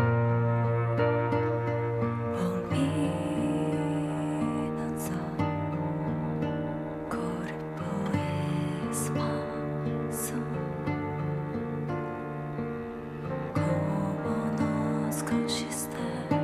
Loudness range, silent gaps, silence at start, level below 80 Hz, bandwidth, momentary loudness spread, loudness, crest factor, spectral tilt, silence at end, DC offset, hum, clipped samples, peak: 4 LU; none; 0 s; -56 dBFS; 14.5 kHz; 7 LU; -30 LUFS; 16 dB; -6.5 dB/octave; 0 s; under 0.1%; none; under 0.1%; -12 dBFS